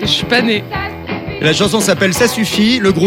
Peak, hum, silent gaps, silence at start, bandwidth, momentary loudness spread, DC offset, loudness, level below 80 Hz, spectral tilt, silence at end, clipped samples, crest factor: 0 dBFS; none; none; 0 s; 17 kHz; 10 LU; under 0.1%; -13 LUFS; -40 dBFS; -4 dB/octave; 0 s; under 0.1%; 14 dB